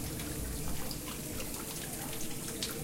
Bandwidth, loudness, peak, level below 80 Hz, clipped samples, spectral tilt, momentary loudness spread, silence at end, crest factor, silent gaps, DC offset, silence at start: 17 kHz; -38 LUFS; -16 dBFS; -46 dBFS; under 0.1%; -3.5 dB/octave; 2 LU; 0 s; 22 dB; none; under 0.1%; 0 s